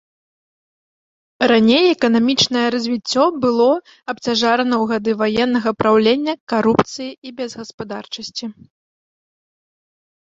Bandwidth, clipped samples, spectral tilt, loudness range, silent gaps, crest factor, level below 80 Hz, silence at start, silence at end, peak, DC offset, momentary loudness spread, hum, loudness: 7.8 kHz; under 0.1%; -4.5 dB/octave; 8 LU; 6.40-6.47 s, 7.18-7.22 s, 7.74-7.78 s; 18 dB; -56 dBFS; 1.4 s; 1.75 s; 0 dBFS; under 0.1%; 15 LU; none; -16 LUFS